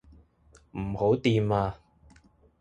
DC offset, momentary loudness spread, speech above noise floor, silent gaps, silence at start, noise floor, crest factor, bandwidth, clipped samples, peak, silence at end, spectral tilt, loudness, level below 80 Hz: under 0.1%; 17 LU; 34 dB; none; 0.75 s; -60 dBFS; 18 dB; 9 kHz; under 0.1%; -10 dBFS; 0.85 s; -7.5 dB/octave; -27 LUFS; -50 dBFS